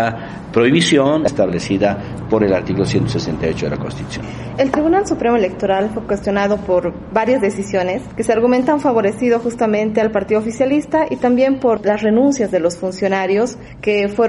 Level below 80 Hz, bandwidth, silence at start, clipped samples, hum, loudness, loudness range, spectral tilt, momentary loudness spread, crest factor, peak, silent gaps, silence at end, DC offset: -42 dBFS; 11.5 kHz; 0 s; under 0.1%; none; -16 LUFS; 2 LU; -6 dB/octave; 7 LU; 16 dB; 0 dBFS; none; 0 s; under 0.1%